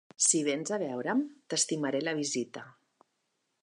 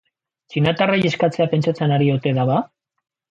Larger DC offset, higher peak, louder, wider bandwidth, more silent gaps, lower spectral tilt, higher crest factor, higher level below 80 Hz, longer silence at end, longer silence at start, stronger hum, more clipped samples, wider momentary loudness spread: neither; second, -10 dBFS vs -4 dBFS; second, -30 LUFS vs -19 LUFS; first, 11.5 kHz vs 7.8 kHz; neither; second, -2.5 dB/octave vs -7.5 dB/octave; first, 24 dB vs 16 dB; second, -88 dBFS vs -58 dBFS; first, 0.9 s vs 0.65 s; second, 0.2 s vs 0.5 s; neither; neither; first, 9 LU vs 5 LU